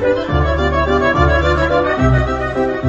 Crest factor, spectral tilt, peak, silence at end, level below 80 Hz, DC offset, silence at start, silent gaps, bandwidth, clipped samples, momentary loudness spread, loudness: 14 dB; -7 dB/octave; 0 dBFS; 0 s; -22 dBFS; under 0.1%; 0 s; none; 7.6 kHz; under 0.1%; 4 LU; -15 LUFS